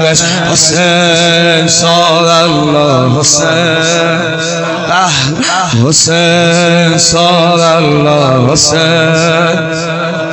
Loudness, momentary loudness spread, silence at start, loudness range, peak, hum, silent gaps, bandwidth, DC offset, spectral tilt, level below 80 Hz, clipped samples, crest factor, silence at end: -8 LUFS; 5 LU; 0 s; 2 LU; 0 dBFS; none; none; over 20 kHz; under 0.1%; -3.5 dB/octave; -42 dBFS; 0.3%; 8 dB; 0 s